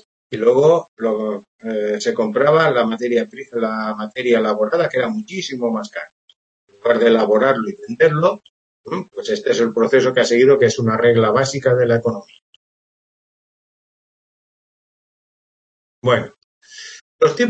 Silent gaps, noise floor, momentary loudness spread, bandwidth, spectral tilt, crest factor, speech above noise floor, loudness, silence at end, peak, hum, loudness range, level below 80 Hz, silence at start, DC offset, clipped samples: 0.88-0.97 s, 1.48-1.59 s, 6.12-6.28 s, 6.36-6.68 s, 8.49-8.84 s, 12.42-16.02 s, 16.38-16.61 s, 17.01-17.19 s; under -90 dBFS; 14 LU; 8.4 kHz; -5.5 dB/octave; 18 dB; over 74 dB; -17 LUFS; 0 s; 0 dBFS; none; 11 LU; -64 dBFS; 0.3 s; under 0.1%; under 0.1%